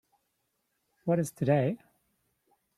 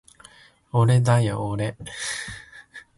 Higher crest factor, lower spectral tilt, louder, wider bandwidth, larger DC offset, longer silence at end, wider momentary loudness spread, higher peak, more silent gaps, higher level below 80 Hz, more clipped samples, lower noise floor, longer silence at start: first, 22 dB vs 16 dB; first, -7.5 dB/octave vs -6 dB/octave; second, -30 LUFS vs -23 LUFS; first, 14 kHz vs 11.5 kHz; neither; first, 1 s vs 0.15 s; second, 12 LU vs 21 LU; second, -12 dBFS vs -8 dBFS; neither; second, -70 dBFS vs -52 dBFS; neither; first, -79 dBFS vs -52 dBFS; first, 1.05 s vs 0.75 s